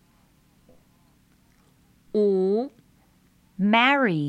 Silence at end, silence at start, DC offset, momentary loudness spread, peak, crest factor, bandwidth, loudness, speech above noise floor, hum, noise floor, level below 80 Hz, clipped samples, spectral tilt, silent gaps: 0 s; 2.15 s; under 0.1%; 15 LU; -6 dBFS; 20 dB; 8.6 kHz; -22 LUFS; 39 dB; none; -60 dBFS; -68 dBFS; under 0.1%; -7 dB/octave; none